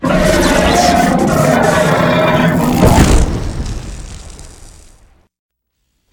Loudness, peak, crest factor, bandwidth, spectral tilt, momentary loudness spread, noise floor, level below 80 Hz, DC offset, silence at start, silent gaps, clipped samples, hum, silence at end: -11 LUFS; 0 dBFS; 12 dB; 19.5 kHz; -5.5 dB/octave; 17 LU; -67 dBFS; -20 dBFS; under 0.1%; 0 s; none; under 0.1%; none; 1.6 s